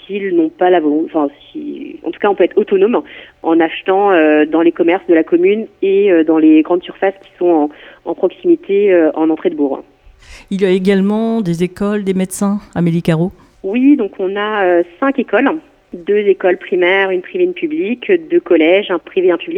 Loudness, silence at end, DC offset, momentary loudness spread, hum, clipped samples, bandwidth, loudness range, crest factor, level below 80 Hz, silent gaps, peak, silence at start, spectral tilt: -13 LUFS; 0 s; under 0.1%; 10 LU; none; under 0.1%; 13.5 kHz; 4 LU; 14 dB; -52 dBFS; none; 0 dBFS; 0.1 s; -6.5 dB/octave